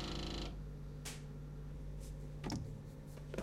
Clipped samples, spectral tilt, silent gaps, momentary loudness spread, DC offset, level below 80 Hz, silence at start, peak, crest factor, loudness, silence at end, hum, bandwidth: under 0.1%; -5 dB/octave; none; 6 LU; under 0.1%; -50 dBFS; 0 s; -26 dBFS; 20 dB; -47 LUFS; 0 s; none; 16 kHz